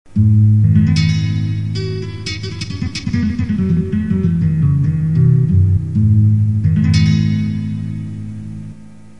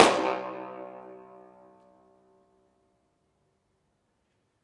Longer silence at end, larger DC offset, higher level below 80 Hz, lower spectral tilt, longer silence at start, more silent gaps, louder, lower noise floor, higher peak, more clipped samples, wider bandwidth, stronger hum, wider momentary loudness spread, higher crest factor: second, 0.3 s vs 3.5 s; first, 1% vs under 0.1%; first, -28 dBFS vs -72 dBFS; first, -7.5 dB/octave vs -3 dB/octave; first, 0.15 s vs 0 s; neither; first, -15 LUFS vs -29 LUFS; second, -37 dBFS vs -74 dBFS; about the same, -2 dBFS vs -2 dBFS; neither; second, 8.8 kHz vs 11.5 kHz; neither; second, 12 LU vs 25 LU; second, 14 dB vs 30 dB